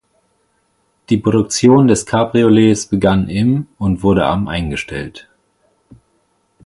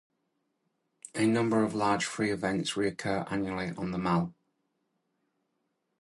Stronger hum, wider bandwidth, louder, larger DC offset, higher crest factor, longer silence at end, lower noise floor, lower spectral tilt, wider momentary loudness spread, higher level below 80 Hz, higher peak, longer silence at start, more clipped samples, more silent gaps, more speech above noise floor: neither; about the same, 11.5 kHz vs 11.5 kHz; first, -14 LUFS vs -30 LUFS; neither; about the same, 16 dB vs 18 dB; second, 1.45 s vs 1.7 s; second, -62 dBFS vs -79 dBFS; about the same, -6 dB/octave vs -5.5 dB/octave; first, 11 LU vs 7 LU; first, -38 dBFS vs -62 dBFS; first, 0 dBFS vs -14 dBFS; about the same, 1.1 s vs 1.15 s; neither; neither; about the same, 49 dB vs 50 dB